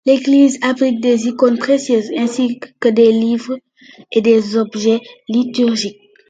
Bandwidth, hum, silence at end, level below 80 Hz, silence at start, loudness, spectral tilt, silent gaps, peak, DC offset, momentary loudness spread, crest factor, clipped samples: 9.2 kHz; none; 0.35 s; -64 dBFS; 0.05 s; -15 LUFS; -5 dB/octave; none; 0 dBFS; under 0.1%; 9 LU; 14 dB; under 0.1%